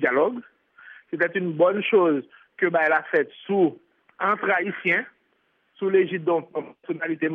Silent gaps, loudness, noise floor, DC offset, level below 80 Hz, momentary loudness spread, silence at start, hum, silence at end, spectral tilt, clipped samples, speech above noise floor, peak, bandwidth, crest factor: none; -23 LUFS; -68 dBFS; under 0.1%; -80 dBFS; 11 LU; 0 s; none; 0 s; -8.5 dB/octave; under 0.1%; 45 dB; -8 dBFS; 4.2 kHz; 16 dB